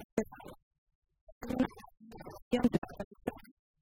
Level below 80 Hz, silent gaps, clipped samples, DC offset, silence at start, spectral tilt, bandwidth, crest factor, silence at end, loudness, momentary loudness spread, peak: -58 dBFS; 0.05-0.17 s, 0.63-0.71 s, 0.78-0.87 s, 0.95-1.02 s, 1.21-1.41 s, 2.42-2.51 s, 2.78-2.82 s, 3.04-3.11 s; under 0.1%; under 0.1%; 0 s; -6.5 dB/octave; 16 kHz; 22 dB; 0.4 s; -36 LUFS; 23 LU; -16 dBFS